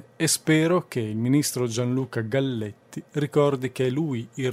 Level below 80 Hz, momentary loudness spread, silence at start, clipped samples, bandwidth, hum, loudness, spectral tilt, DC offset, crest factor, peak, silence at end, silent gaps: -64 dBFS; 9 LU; 0.2 s; under 0.1%; 16 kHz; none; -24 LUFS; -5 dB/octave; under 0.1%; 18 dB; -8 dBFS; 0 s; none